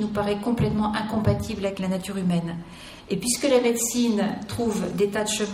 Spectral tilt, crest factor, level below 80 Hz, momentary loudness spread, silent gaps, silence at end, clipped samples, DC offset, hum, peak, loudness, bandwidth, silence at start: -5 dB/octave; 16 dB; -48 dBFS; 8 LU; none; 0 s; under 0.1%; under 0.1%; none; -8 dBFS; -24 LUFS; 16 kHz; 0 s